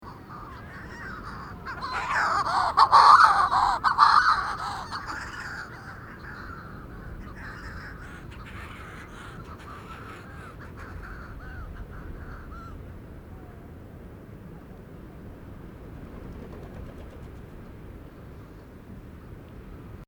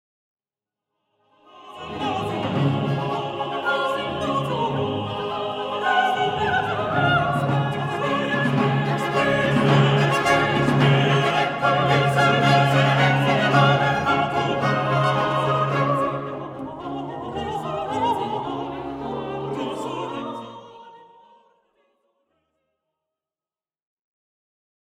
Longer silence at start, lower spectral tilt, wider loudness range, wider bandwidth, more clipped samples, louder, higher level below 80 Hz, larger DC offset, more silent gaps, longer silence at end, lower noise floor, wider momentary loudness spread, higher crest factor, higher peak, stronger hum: second, 0 s vs 1.55 s; second, -3.5 dB/octave vs -6 dB/octave; first, 24 LU vs 12 LU; first, 20 kHz vs 12 kHz; neither; about the same, -21 LUFS vs -21 LUFS; first, -46 dBFS vs -52 dBFS; neither; neither; second, 0.05 s vs 4.05 s; second, -45 dBFS vs under -90 dBFS; first, 25 LU vs 13 LU; first, 26 dB vs 18 dB; about the same, -2 dBFS vs -4 dBFS; neither